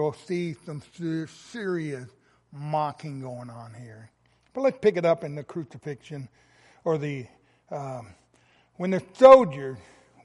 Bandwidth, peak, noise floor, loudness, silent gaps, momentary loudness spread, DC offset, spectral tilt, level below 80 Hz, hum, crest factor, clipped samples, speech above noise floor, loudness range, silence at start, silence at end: 11 kHz; -2 dBFS; -62 dBFS; -24 LUFS; none; 23 LU; under 0.1%; -7 dB/octave; -66 dBFS; none; 24 dB; under 0.1%; 38 dB; 12 LU; 0 s; 0.45 s